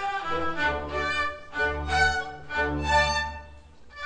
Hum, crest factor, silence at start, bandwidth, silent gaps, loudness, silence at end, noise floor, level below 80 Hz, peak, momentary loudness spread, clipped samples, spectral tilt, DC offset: none; 18 dB; 0 s; 10 kHz; none; -26 LUFS; 0 s; -47 dBFS; -40 dBFS; -10 dBFS; 8 LU; under 0.1%; -4 dB/octave; under 0.1%